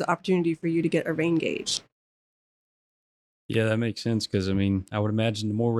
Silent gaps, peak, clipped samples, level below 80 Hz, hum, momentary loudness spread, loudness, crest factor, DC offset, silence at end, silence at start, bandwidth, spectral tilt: 1.92-3.49 s; -8 dBFS; under 0.1%; -60 dBFS; none; 3 LU; -26 LUFS; 18 dB; under 0.1%; 0 s; 0 s; 12.5 kHz; -5.5 dB/octave